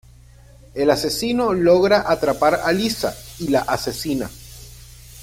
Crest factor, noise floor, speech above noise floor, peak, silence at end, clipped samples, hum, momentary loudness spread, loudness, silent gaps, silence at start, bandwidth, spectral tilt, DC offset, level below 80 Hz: 18 dB; -46 dBFS; 27 dB; -2 dBFS; 0 s; under 0.1%; none; 16 LU; -19 LUFS; none; 0.75 s; 16.5 kHz; -4.5 dB/octave; under 0.1%; -44 dBFS